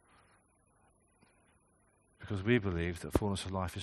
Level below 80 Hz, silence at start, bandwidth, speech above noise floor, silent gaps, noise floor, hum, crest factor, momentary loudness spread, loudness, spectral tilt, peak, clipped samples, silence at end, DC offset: -54 dBFS; 2.2 s; 11.5 kHz; 37 dB; none; -71 dBFS; none; 24 dB; 9 LU; -35 LUFS; -6 dB/octave; -14 dBFS; under 0.1%; 0 s; under 0.1%